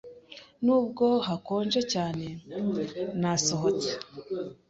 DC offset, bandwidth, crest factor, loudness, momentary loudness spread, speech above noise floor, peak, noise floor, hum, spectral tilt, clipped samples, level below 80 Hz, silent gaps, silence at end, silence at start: under 0.1%; 8.2 kHz; 18 dB; -28 LUFS; 12 LU; 22 dB; -12 dBFS; -50 dBFS; none; -4.5 dB/octave; under 0.1%; -64 dBFS; none; 0.15 s; 0.05 s